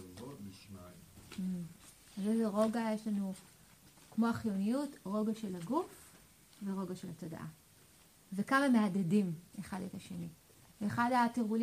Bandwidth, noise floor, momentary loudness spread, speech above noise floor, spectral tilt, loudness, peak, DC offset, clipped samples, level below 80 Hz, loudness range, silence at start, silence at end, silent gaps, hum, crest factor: 15.5 kHz; -63 dBFS; 19 LU; 28 dB; -6.5 dB/octave; -36 LUFS; -18 dBFS; under 0.1%; under 0.1%; -72 dBFS; 5 LU; 0 s; 0 s; none; none; 18 dB